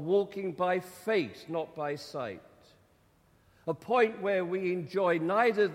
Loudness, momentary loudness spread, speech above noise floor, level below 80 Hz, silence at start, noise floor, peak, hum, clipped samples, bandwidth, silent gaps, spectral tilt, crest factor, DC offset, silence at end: -31 LUFS; 11 LU; 36 dB; -74 dBFS; 0 s; -65 dBFS; -12 dBFS; none; under 0.1%; 16 kHz; none; -6 dB/octave; 18 dB; under 0.1%; 0 s